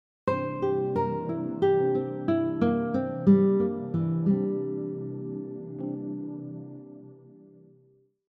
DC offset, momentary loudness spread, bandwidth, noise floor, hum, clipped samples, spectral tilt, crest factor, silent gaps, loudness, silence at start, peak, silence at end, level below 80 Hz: under 0.1%; 15 LU; 5 kHz; -63 dBFS; none; under 0.1%; -10.5 dB/octave; 18 dB; none; -27 LUFS; 0.25 s; -10 dBFS; 0.8 s; -66 dBFS